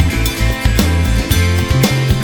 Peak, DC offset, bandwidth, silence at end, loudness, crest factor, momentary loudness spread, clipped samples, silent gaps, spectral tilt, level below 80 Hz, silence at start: 0 dBFS; under 0.1%; 19.5 kHz; 0 s; -14 LUFS; 12 dB; 3 LU; under 0.1%; none; -5 dB/octave; -18 dBFS; 0 s